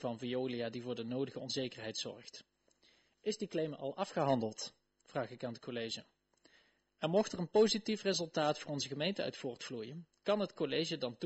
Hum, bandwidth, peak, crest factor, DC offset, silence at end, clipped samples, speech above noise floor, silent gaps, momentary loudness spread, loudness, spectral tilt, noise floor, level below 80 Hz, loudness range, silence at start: none; 8.2 kHz; -18 dBFS; 20 dB; under 0.1%; 0 s; under 0.1%; 34 dB; none; 11 LU; -38 LUFS; -4.5 dB/octave; -71 dBFS; -76 dBFS; 6 LU; 0 s